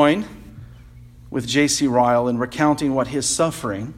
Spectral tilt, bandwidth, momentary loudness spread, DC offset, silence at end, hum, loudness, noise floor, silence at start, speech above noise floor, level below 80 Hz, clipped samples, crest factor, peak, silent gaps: -4 dB/octave; 15 kHz; 11 LU; under 0.1%; 0.05 s; none; -20 LUFS; -43 dBFS; 0 s; 23 dB; -48 dBFS; under 0.1%; 18 dB; -2 dBFS; none